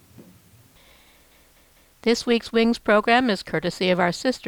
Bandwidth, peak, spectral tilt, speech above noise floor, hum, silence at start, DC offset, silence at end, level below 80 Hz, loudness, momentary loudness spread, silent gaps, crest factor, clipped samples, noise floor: 19.5 kHz; -6 dBFS; -4.5 dB/octave; 35 dB; none; 0.2 s; under 0.1%; 0 s; -56 dBFS; -21 LUFS; 7 LU; none; 18 dB; under 0.1%; -56 dBFS